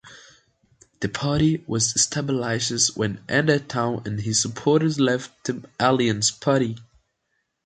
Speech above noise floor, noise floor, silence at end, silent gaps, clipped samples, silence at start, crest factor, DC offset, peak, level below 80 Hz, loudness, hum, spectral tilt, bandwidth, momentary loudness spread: 52 dB; -75 dBFS; 0.8 s; none; under 0.1%; 0.05 s; 20 dB; under 0.1%; -4 dBFS; -52 dBFS; -22 LUFS; none; -4 dB/octave; 9.4 kHz; 9 LU